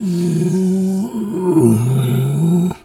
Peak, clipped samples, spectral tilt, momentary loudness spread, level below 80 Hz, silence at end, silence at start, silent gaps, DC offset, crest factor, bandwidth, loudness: 0 dBFS; under 0.1%; -8 dB/octave; 6 LU; -52 dBFS; 0.1 s; 0 s; none; under 0.1%; 14 dB; 15.5 kHz; -16 LUFS